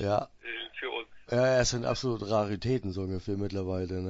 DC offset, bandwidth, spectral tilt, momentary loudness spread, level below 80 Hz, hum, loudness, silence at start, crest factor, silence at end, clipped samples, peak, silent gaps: under 0.1%; 8 kHz; -5 dB/octave; 11 LU; -52 dBFS; none; -31 LUFS; 0 s; 18 dB; 0 s; under 0.1%; -12 dBFS; none